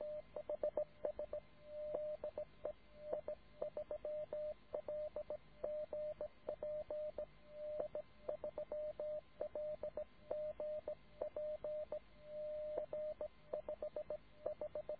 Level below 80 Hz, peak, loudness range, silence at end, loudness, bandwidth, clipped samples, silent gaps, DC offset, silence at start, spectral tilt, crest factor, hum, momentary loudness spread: -70 dBFS; -28 dBFS; 1 LU; 0 s; -47 LUFS; 4.8 kHz; under 0.1%; none; under 0.1%; 0 s; -5.5 dB/octave; 18 dB; none; 5 LU